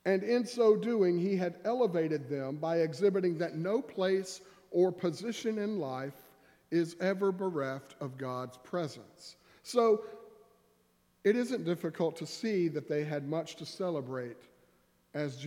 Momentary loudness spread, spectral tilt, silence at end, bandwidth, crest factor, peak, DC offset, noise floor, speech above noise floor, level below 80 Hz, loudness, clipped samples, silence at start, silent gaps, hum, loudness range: 13 LU; -6.5 dB/octave; 0 s; 15.5 kHz; 18 dB; -14 dBFS; under 0.1%; -71 dBFS; 39 dB; -82 dBFS; -33 LUFS; under 0.1%; 0.05 s; none; none; 5 LU